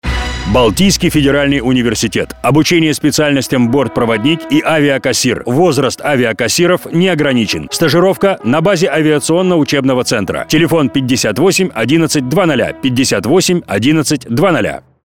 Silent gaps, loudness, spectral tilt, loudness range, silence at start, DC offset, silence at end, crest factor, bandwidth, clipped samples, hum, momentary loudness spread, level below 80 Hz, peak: none; -12 LUFS; -4.5 dB/octave; 1 LU; 0.05 s; 0.5%; 0.25 s; 12 dB; 17.5 kHz; under 0.1%; none; 4 LU; -32 dBFS; 0 dBFS